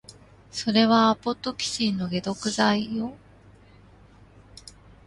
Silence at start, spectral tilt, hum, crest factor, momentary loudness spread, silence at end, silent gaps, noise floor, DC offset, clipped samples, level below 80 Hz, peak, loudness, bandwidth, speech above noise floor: 0.1 s; -4.5 dB/octave; none; 20 dB; 17 LU; 0.35 s; none; -52 dBFS; under 0.1%; under 0.1%; -56 dBFS; -6 dBFS; -24 LUFS; 11.5 kHz; 28 dB